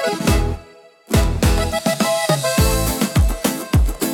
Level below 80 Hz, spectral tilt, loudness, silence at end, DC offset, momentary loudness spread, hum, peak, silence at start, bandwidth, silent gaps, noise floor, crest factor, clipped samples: -22 dBFS; -5 dB/octave; -18 LUFS; 0 s; under 0.1%; 4 LU; none; -2 dBFS; 0 s; 17.5 kHz; none; -45 dBFS; 16 dB; under 0.1%